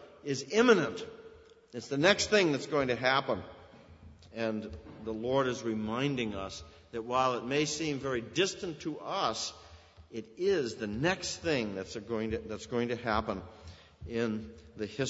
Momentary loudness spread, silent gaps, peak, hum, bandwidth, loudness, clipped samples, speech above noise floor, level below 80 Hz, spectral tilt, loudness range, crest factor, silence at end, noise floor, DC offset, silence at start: 18 LU; none; -8 dBFS; none; 8 kHz; -32 LUFS; under 0.1%; 23 dB; -58 dBFS; -4 dB/octave; 6 LU; 24 dB; 0 s; -55 dBFS; under 0.1%; 0 s